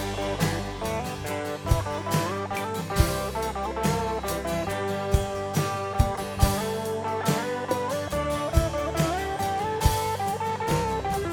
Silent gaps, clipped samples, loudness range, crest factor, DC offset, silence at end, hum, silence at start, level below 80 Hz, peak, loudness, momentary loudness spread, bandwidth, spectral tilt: none; under 0.1%; 1 LU; 20 dB; under 0.1%; 0 s; none; 0 s; -34 dBFS; -6 dBFS; -27 LUFS; 5 LU; over 20 kHz; -5 dB/octave